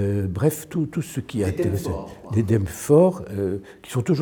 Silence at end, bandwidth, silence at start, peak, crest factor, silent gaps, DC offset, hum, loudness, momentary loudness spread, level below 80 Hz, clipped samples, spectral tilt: 0 s; over 20 kHz; 0 s; -4 dBFS; 18 dB; none; under 0.1%; none; -23 LUFS; 12 LU; -50 dBFS; under 0.1%; -7.5 dB/octave